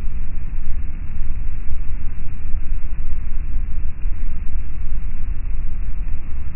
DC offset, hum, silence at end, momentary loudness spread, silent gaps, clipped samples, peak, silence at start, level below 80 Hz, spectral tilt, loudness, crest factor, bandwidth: under 0.1%; none; 0 s; 2 LU; none; under 0.1%; -2 dBFS; 0 s; -20 dBFS; -11.5 dB/octave; -30 LUFS; 10 dB; 2.7 kHz